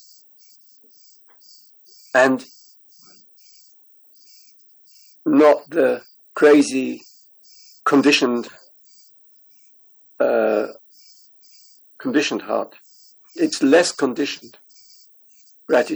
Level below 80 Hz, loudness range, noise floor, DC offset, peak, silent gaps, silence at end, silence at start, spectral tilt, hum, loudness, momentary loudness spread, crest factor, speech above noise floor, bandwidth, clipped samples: -74 dBFS; 7 LU; -52 dBFS; under 0.1%; -2 dBFS; none; 0 s; 2.15 s; -3.5 dB/octave; none; -18 LUFS; 16 LU; 20 dB; 35 dB; over 20 kHz; under 0.1%